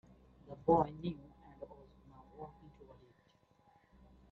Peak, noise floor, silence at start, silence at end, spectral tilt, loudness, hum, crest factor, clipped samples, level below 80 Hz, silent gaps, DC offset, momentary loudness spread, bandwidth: -16 dBFS; -71 dBFS; 0.5 s; 1.8 s; -8 dB/octave; -35 LUFS; none; 26 dB; under 0.1%; -64 dBFS; none; under 0.1%; 28 LU; 6 kHz